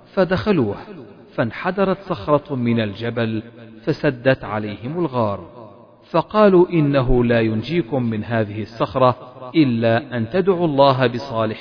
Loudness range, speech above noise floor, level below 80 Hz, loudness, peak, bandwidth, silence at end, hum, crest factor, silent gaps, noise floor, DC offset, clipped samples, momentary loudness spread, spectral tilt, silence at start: 4 LU; 24 dB; -38 dBFS; -19 LUFS; 0 dBFS; 5.4 kHz; 0 s; none; 18 dB; none; -43 dBFS; under 0.1%; under 0.1%; 11 LU; -9 dB/octave; 0.15 s